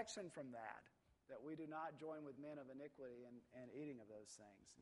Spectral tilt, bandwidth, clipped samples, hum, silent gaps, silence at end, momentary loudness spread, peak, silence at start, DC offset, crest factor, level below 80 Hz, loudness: -4.5 dB/octave; 11.5 kHz; under 0.1%; none; none; 0 s; 10 LU; -34 dBFS; 0 s; under 0.1%; 20 dB; -88 dBFS; -55 LUFS